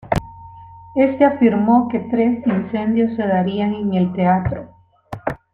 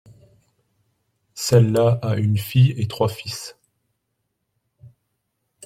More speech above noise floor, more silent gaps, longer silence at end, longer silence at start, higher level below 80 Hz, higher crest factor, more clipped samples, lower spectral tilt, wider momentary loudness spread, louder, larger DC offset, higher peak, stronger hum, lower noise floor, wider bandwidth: second, 23 dB vs 57 dB; neither; second, 0.15 s vs 0.8 s; second, 0.05 s vs 1.35 s; first, -44 dBFS vs -56 dBFS; about the same, 16 dB vs 20 dB; neither; first, -9 dB/octave vs -6.5 dB/octave; second, 12 LU vs 15 LU; about the same, -18 LUFS vs -20 LUFS; neither; about the same, -2 dBFS vs -4 dBFS; neither; second, -39 dBFS vs -75 dBFS; second, 7.2 kHz vs 14.5 kHz